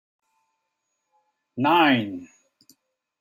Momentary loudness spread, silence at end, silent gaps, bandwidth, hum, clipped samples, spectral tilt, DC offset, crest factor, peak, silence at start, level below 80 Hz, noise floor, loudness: 21 LU; 0.95 s; none; 16.5 kHz; none; under 0.1%; -6.5 dB/octave; under 0.1%; 20 dB; -6 dBFS; 1.55 s; -76 dBFS; -78 dBFS; -20 LUFS